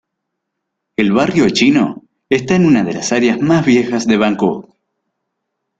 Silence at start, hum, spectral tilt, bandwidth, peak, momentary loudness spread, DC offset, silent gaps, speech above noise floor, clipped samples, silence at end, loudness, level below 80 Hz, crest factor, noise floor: 1 s; none; -5.5 dB/octave; 9 kHz; 0 dBFS; 7 LU; under 0.1%; none; 63 dB; under 0.1%; 1.2 s; -13 LUFS; -50 dBFS; 14 dB; -75 dBFS